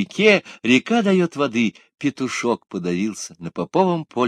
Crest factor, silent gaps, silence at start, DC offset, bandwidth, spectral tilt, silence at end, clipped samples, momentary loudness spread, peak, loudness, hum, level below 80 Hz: 20 dB; none; 0 s; under 0.1%; 11 kHz; -5 dB/octave; 0 s; under 0.1%; 11 LU; 0 dBFS; -20 LUFS; none; -64 dBFS